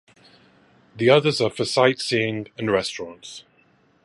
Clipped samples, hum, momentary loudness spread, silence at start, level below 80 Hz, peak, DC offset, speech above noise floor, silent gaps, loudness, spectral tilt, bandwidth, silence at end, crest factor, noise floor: under 0.1%; none; 20 LU; 0.95 s; -62 dBFS; -2 dBFS; under 0.1%; 38 dB; none; -21 LUFS; -4.5 dB/octave; 11.5 kHz; 0.65 s; 22 dB; -60 dBFS